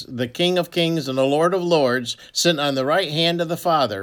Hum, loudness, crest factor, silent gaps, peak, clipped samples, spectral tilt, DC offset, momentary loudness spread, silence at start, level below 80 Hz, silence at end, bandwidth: none; -20 LUFS; 16 dB; none; -4 dBFS; under 0.1%; -4.5 dB/octave; under 0.1%; 4 LU; 0 s; -64 dBFS; 0 s; 19 kHz